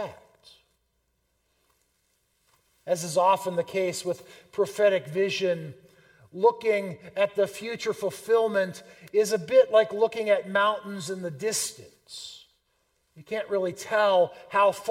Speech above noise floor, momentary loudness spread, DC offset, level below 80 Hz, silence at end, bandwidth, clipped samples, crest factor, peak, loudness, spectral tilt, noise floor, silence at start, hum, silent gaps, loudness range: 48 dB; 15 LU; under 0.1%; -74 dBFS; 0 s; 16.5 kHz; under 0.1%; 20 dB; -8 dBFS; -26 LUFS; -3.5 dB/octave; -74 dBFS; 0 s; none; none; 6 LU